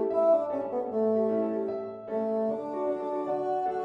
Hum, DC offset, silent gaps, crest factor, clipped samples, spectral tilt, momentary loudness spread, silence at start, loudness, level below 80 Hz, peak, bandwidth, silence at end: none; under 0.1%; none; 14 dB; under 0.1%; -9 dB/octave; 8 LU; 0 s; -29 LUFS; -74 dBFS; -14 dBFS; 5.8 kHz; 0 s